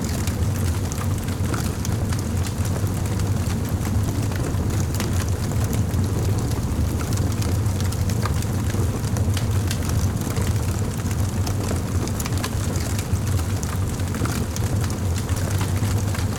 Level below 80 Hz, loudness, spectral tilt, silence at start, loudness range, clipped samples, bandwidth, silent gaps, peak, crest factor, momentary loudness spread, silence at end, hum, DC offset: -30 dBFS; -24 LUFS; -5.5 dB/octave; 0 s; 1 LU; under 0.1%; 18.5 kHz; none; -8 dBFS; 14 dB; 2 LU; 0 s; none; under 0.1%